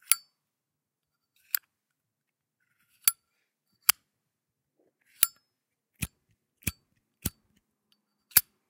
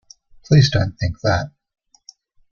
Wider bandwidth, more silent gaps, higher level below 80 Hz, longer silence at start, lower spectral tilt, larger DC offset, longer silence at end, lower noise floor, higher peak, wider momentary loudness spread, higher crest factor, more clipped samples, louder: first, 16.5 kHz vs 7 kHz; neither; second, -58 dBFS vs -42 dBFS; second, 0.1 s vs 0.5 s; second, -0.5 dB/octave vs -6 dB/octave; neither; second, 0.3 s vs 1.05 s; first, -87 dBFS vs -49 dBFS; about the same, 0 dBFS vs -2 dBFS; first, 15 LU vs 9 LU; first, 34 dB vs 18 dB; neither; second, -28 LUFS vs -18 LUFS